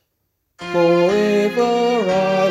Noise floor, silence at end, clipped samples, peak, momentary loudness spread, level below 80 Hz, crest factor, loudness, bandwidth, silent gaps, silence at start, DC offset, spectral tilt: -71 dBFS; 0 s; under 0.1%; -4 dBFS; 4 LU; -56 dBFS; 14 dB; -17 LUFS; 13.5 kHz; none; 0.6 s; under 0.1%; -6 dB/octave